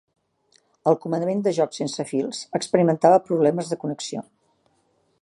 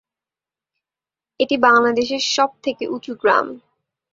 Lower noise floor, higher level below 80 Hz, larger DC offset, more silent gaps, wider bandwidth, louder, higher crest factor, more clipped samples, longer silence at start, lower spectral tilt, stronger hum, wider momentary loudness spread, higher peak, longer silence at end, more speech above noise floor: second, -66 dBFS vs -90 dBFS; second, -72 dBFS vs -64 dBFS; neither; neither; first, 11.5 kHz vs 7.8 kHz; second, -22 LUFS vs -18 LUFS; about the same, 20 dB vs 20 dB; neither; second, 0.85 s vs 1.4 s; first, -6 dB/octave vs -2.5 dB/octave; neither; about the same, 11 LU vs 13 LU; about the same, -2 dBFS vs -2 dBFS; first, 1 s vs 0.55 s; second, 45 dB vs 72 dB